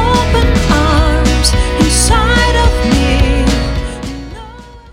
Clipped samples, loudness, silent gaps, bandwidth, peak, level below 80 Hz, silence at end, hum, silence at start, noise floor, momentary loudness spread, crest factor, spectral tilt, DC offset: under 0.1%; -11 LUFS; none; 16 kHz; 0 dBFS; -14 dBFS; 0.1 s; none; 0 s; -32 dBFS; 14 LU; 10 dB; -4.5 dB/octave; under 0.1%